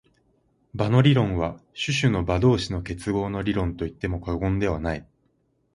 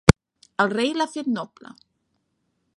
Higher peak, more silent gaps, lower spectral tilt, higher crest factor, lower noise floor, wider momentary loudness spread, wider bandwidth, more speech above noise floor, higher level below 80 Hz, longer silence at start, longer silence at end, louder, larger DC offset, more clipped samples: second, -4 dBFS vs 0 dBFS; neither; about the same, -6.5 dB/octave vs -5.5 dB/octave; about the same, 20 dB vs 24 dB; second, -68 dBFS vs -73 dBFS; about the same, 11 LU vs 12 LU; second, 11.5 kHz vs 13 kHz; about the same, 45 dB vs 48 dB; about the same, -40 dBFS vs -36 dBFS; first, 0.75 s vs 0.05 s; second, 0.7 s vs 1.3 s; about the same, -24 LUFS vs -24 LUFS; neither; neither